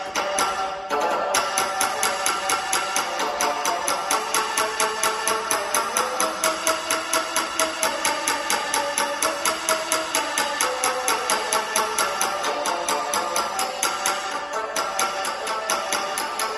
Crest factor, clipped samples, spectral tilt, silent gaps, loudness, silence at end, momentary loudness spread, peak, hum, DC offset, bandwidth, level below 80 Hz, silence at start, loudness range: 22 dB; under 0.1%; 0 dB/octave; none; -23 LUFS; 0 s; 3 LU; -2 dBFS; none; under 0.1%; 16 kHz; -60 dBFS; 0 s; 2 LU